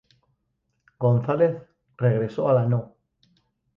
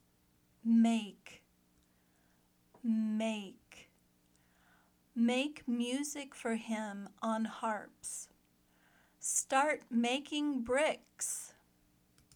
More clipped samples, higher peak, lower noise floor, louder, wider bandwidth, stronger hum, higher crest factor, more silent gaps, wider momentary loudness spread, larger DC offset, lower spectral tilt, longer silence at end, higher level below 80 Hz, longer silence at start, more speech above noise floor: neither; first, -8 dBFS vs -16 dBFS; about the same, -75 dBFS vs -72 dBFS; first, -23 LUFS vs -35 LUFS; second, 5 kHz vs 18 kHz; second, none vs 60 Hz at -65 dBFS; about the same, 16 dB vs 20 dB; neither; second, 5 LU vs 13 LU; neither; first, -10.5 dB/octave vs -3.5 dB/octave; about the same, 0.9 s vs 0.85 s; first, -62 dBFS vs -76 dBFS; first, 1 s vs 0.65 s; first, 54 dB vs 37 dB